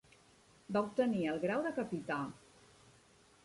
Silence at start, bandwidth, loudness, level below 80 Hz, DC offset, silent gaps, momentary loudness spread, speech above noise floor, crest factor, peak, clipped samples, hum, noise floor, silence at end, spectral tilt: 0.7 s; 11.5 kHz; -37 LUFS; -74 dBFS; under 0.1%; none; 7 LU; 30 dB; 18 dB; -20 dBFS; under 0.1%; none; -65 dBFS; 1.05 s; -6.5 dB/octave